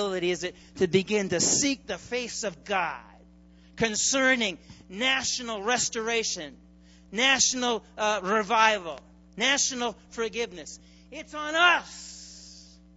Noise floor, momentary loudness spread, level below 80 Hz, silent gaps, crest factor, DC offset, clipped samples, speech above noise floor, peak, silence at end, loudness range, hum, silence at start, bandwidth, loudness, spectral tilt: -54 dBFS; 20 LU; -58 dBFS; none; 22 dB; under 0.1%; under 0.1%; 27 dB; -6 dBFS; 0.3 s; 3 LU; none; 0 s; 8.2 kHz; -26 LUFS; -1.5 dB/octave